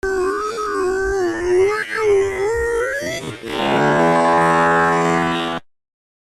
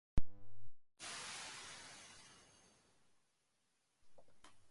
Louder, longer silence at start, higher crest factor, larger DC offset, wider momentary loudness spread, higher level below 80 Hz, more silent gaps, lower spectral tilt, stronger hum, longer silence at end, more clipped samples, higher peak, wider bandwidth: first, -18 LUFS vs -50 LUFS; about the same, 0.05 s vs 0.15 s; second, 14 dB vs 20 dB; neither; second, 9 LU vs 21 LU; first, -42 dBFS vs -56 dBFS; neither; first, -5 dB/octave vs -3 dB/octave; neither; first, 0.7 s vs 0.1 s; neither; first, -4 dBFS vs -20 dBFS; first, 13 kHz vs 11.5 kHz